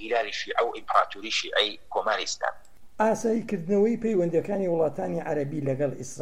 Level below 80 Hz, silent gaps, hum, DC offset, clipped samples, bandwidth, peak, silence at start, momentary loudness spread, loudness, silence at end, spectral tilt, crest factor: -60 dBFS; none; none; 0.7%; under 0.1%; 14.5 kHz; -8 dBFS; 0 s; 5 LU; -27 LUFS; 0 s; -4.5 dB/octave; 20 dB